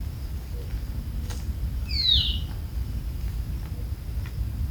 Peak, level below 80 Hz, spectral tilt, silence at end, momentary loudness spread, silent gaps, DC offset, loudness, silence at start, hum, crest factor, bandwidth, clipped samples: -8 dBFS; -32 dBFS; -4.5 dB/octave; 0 s; 14 LU; none; under 0.1%; -28 LUFS; 0 s; none; 20 dB; over 20 kHz; under 0.1%